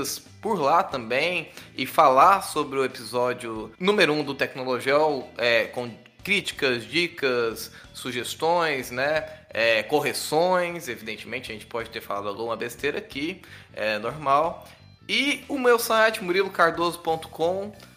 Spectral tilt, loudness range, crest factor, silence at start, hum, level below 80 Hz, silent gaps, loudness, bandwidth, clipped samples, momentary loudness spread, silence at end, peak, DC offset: -3.5 dB/octave; 6 LU; 20 dB; 0 s; none; -60 dBFS; none; -24 LUFS; 16 kHz; under 0.1%; 12 LU; 0.1 s; -4 dBFS; under 0.1%